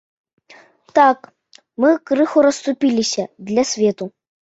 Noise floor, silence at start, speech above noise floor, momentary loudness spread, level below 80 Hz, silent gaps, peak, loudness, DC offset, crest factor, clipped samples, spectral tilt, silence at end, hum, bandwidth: -48 dBFS; 0.95 s; 32 dB; 12 LU; -64 dBFS; none; -2 dBFS; -17 LUFS; under 0.1%; 18 dB; under 0.1%; -4 dB/octave; 0.4 s; none; 8 kHz